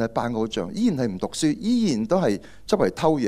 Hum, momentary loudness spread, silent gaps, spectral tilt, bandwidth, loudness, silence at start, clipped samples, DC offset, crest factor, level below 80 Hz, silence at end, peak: none; 5 LU; none; -6 dB/octave; 14 kHz; -24 LUFS; 0 s; under 0.1%; under 0.1%; 18 dB; -52 dBFS; 0 s; -6 dBFS